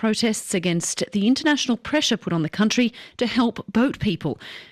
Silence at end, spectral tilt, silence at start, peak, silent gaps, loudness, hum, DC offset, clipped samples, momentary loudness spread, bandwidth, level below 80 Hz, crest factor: 0.05 s; -4 dB/octave; 0 s; -8 dBFS; none; -22 LUFS; none; under 0.1%; under 0.1%; 5 LU; 14.5 kHz; -54 dBFS; 14 dB